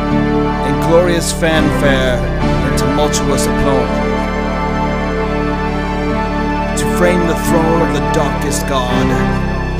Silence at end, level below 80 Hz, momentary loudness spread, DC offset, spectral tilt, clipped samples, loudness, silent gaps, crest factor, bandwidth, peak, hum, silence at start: 0 s; -22 dBFS; 5 LU; under 0.1%; -5.5 dB/octave; under 0.1%; -14 LUFS; none; 14 dB; 16 kHz; 0 dBFS; none; 0 s